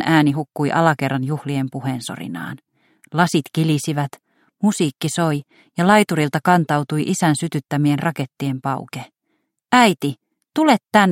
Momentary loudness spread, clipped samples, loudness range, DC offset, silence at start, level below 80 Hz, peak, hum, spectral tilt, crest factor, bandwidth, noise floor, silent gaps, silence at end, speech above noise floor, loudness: 14 LU; under 0.1%; 4 LU; under 0.1%; 0 s; -62 dBFS; 0 dBFS; none; -5.5 dB/octave; 18 dB; 16.5 kHz; -71 dBFS; none; 0 s; 53 dB; -19 LUFS